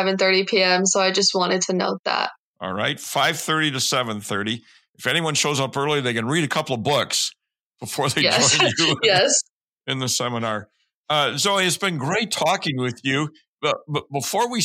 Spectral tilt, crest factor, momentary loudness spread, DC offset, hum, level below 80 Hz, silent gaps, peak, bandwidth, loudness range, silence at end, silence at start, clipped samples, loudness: -2.5 dB/octave; 18 dB; 10 LU; under 0.1%; none; -70 dBFS; 1.99-2.04 s, 2.38-2.54 s, 4.89-4.93 s, 7.63-7.71 s, 9.50-9.76 s, 10.94-11.04 s, 13.48-13.57 s; -4 dBFS; 16.5 kHz; 3 LU; 0 s; 0 s; under 0.1%; -20 LUFS